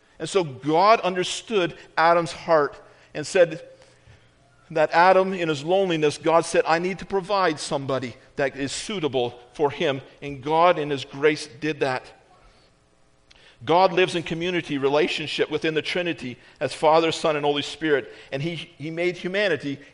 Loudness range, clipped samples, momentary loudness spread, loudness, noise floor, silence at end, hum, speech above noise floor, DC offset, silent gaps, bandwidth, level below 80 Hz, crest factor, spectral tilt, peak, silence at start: 4 LU; under 0.1%; 11 LU; -23 LUFS; -59 dBFS; 0.1 s; none; 37 dB; under 0.1%; none; 10.5 kHz; -58 dBFS; 20 dB; -4.5 dB/octave; -4 dBFS; 0.2 s